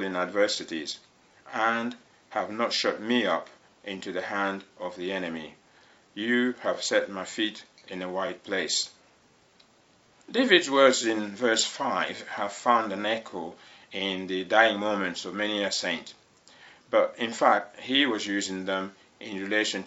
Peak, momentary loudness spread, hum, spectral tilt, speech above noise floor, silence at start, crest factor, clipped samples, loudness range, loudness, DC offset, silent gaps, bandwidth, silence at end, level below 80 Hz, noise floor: -4 dBFS; 17 LU; none; -2.5 dB/octave; 34 dB; 0 s; 26 dB; under 0.1%; 6 LU; -27 LUFS; under 0.1%; none; 8.2 kHz; 0 s; -76 dBFS; -61 dBFS